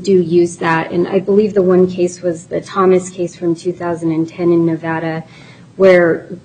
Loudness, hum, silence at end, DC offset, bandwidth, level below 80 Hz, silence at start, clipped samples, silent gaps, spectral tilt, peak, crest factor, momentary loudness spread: -14 LUFS; none; 0.05 s; under 0.1%; 9.4 kHz; -56 dBFS; 0 s; under 0.1%; none; -7 dB/octave; 0 dBFS; 14 dB; 9 LU